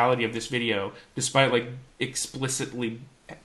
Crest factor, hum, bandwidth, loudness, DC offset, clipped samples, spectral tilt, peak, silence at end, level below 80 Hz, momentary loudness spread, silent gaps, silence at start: 22 dB; none; 13 kHz; -27 LUFS; under 0.1%; under 0.1%; -3.5 dB/octave; -4 dBFS; 0.05 s; -60 dBFS; 13 LU; none; 0 s